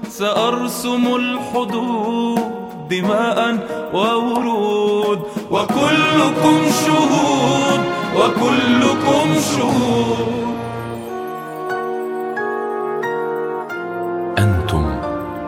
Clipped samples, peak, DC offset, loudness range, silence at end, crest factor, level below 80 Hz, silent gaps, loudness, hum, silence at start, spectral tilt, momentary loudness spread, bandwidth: under 0.1%; 0 dBFS; under 0.1%; 8 LU; 0 s; 16 dB; -40 dBFS; none; -18 LUFS; none; 0 s; -5 dB/octave; 10 LU; 16 kHz